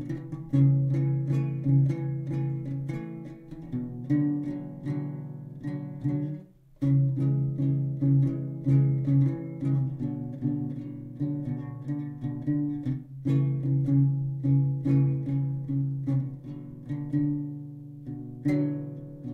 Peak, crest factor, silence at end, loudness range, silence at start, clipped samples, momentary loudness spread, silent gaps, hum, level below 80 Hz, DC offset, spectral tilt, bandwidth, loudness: -12 dBFS; 16 dB; 0 s; 6 LU; 0 s; under 0.1%; 14 LU; none; none; -58 dBFS; under 0.1%; -11 dB/octave; 2.6 kHz; -28 LUFS